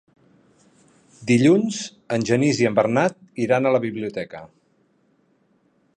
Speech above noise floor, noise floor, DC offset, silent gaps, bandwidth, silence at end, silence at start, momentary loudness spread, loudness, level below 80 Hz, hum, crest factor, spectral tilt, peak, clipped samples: 43 dB; -63 dBFS; under 0.1%; none; 10 kHz; 1.5 s; 1.2 s; 15 LU; -21 LUFS; -64 dBFS; none; 18 dB; -6 dB/octave; -4 dBFS; under 0.1%